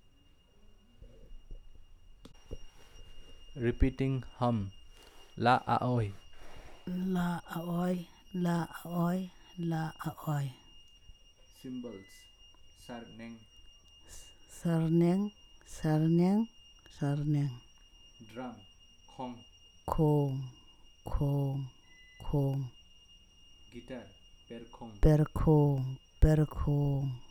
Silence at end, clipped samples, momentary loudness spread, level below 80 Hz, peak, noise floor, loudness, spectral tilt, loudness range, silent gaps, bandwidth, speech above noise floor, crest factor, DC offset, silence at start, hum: 0 s; under 0.1%; 23 LU; -44 dBFS; -10 dBFS; -62 dBFS; -32 LUFS; -8 dB/octave; 10 LU; none; 17.5 kHz; 31 dB; 24 dB; under 0.1%; 1 s; none